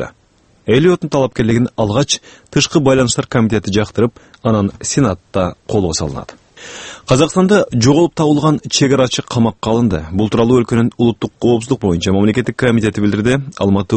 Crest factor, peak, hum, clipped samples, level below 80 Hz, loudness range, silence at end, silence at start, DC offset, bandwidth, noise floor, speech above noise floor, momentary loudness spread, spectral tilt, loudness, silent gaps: 14 dB; 0 dBFS; none; under 0.1%; -40 dBFS; 3 LU; 0 s; 0 s; under 0.1%; 8.8 kHz; -52 dBFS; 39 dB; 7 LU; -5.5 dB/octave; -14 LUFS; none